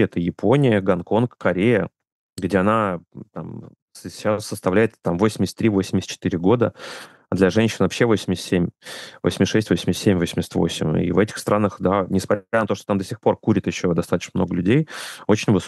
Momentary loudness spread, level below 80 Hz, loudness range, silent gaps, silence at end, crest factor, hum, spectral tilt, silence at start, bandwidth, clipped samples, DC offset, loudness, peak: 13 LU; -52 dBFS; 2 LU; 2.12-2.29 s, 3.82-3.88 s; 0 s; 18 dB; none; -6 dB/octave; 0 s; 12.5 kHz; under 0.1%; under 0.1%; -21 LUFS; -4 dBFS